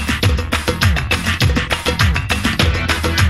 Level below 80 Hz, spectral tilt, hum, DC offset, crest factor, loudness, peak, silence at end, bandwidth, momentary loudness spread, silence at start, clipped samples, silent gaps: -22 dBFS; -4.5 dB/octave; none; 0.7%; 16 dB; -16 LUFS; 0 dBFS; 0 s; 16 kHz; 2 LU; 0 s; under 0.1%; none